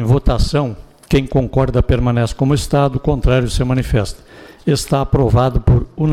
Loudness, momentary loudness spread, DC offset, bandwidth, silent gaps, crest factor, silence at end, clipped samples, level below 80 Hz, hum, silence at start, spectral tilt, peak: -16 LUFS; 5 LU; under 0.1%; 14 kHz; none; 12 dB; 0 s; under 0.1%; -22 dBFS; none; 0 s; -7 dB/octave; -4 dBFS